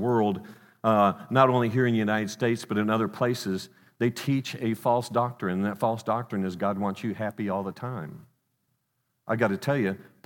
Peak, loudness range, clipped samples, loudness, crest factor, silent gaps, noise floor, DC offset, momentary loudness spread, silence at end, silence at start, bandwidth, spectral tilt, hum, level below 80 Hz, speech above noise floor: -4 dBFS; 7 LU; under 0.1%; -27 LUFS; 22 dB; none; -77 dBFS; under 0.1%; 10 LU; 0.25 s; 0 s; 17.5 kHz; -6.5 dB/octave; none; -76 dBFS; 51 dB